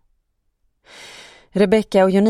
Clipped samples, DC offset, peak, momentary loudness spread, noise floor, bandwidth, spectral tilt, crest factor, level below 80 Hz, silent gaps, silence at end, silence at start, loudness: under 0.1%; under 0.1%; -2 dBFS; 23 LU; -68 dBFS; 12 kHz; -7 dB/octave; 18 dB; -52 dBFS; none; 0 s; 1.05 s; -17 LUFS